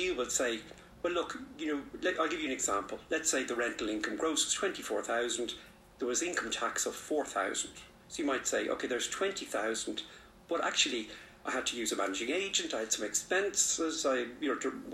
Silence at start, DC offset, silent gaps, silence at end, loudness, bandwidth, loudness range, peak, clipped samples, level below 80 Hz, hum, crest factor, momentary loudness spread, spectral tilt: 0 s; under 0.1%; none; 0 s; -33 LUFS; 15.5 kHz; 3 LU; -14 dBFS; under 0.1%; -64 dBFS; none; 20 dB; 9 LU; -1 dB/octave